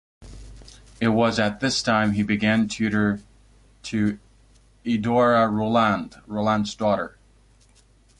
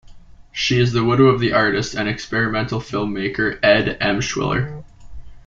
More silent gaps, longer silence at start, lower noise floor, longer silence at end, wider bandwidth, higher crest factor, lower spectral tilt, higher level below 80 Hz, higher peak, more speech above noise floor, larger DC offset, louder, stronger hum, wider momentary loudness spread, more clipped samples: neither; first, 0.2 s vs 0.05 s; first, -56 dBFS vs -41 dBFS; first, 1.1 s vs 0.05 s; first, 11 kHz vs 7.6 kHz; about the same, 16 dB vs 18 dB; about the same, -5.5 dB/octave vs -5.5 dB/octave; second, -50 dBFS vs -42 dBFS; second, -8 dBFS vs -2 dBFS; first, 35 dB vs 23 dB; neither; second, -22 LUFS vs -18 LUFS; neither; about the same, 11 LU vs 9 LU; neither